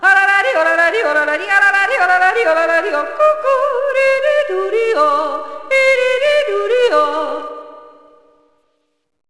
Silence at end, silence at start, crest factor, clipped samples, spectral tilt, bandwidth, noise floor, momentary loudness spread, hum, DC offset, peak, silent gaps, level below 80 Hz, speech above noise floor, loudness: 1.4 s; 0 s; 14 dB; under 0.1%; -1.5 dB/octave; 11 kHz; -65 dBFS; 7 LU; none; 0.9%; 0 dBFS; none; -60 dBFS; 51 dB; -13 LUFS